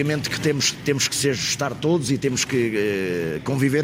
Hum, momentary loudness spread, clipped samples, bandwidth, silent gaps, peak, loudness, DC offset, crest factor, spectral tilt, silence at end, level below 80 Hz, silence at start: none; 4 LU; under 0.1%; 16 kHz; none; -6 dBFS; -22 LUFS; under 0.1%; 16 dB; -4 dB/octave; 0 s; -54 dBFS; 0 s